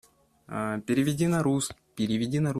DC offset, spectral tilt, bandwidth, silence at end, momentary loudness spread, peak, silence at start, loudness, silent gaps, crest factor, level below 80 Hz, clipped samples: under 0.1%; -6 dB/octave; 14.5 kHz; 0 s; 9 LU; -12 dBFS; 0.5 s; -28 LUFS; none; 14 dB; -60 dBFS; under 0.1%